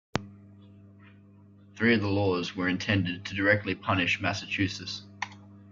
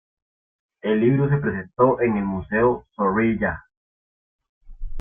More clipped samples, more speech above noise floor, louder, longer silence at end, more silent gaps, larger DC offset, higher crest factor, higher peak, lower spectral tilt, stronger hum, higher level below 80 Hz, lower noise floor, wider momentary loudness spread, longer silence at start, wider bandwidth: neither; second, 27 dB vs over 70 dB; second, -28 LUFS vs -21 LUFS; about the same, 0 s vs 0 s; second, none vs 3.77-4.39 s, 4.49-4.61 s; neither; about the same, 22 dB vs 18 dB; second, -8 dBFS vs -4 dBFS; second, -5.5 dB/octave vs -12 dB/octave; neither; second, -62 dBFS vs -42 dBFS; second, -54 dBFS vs under -90 dBFS; first, 12 LU vs 8 LU; second, 0.15 s vs 0.85 s; first, 7.4 kHz vs 3.6 kHz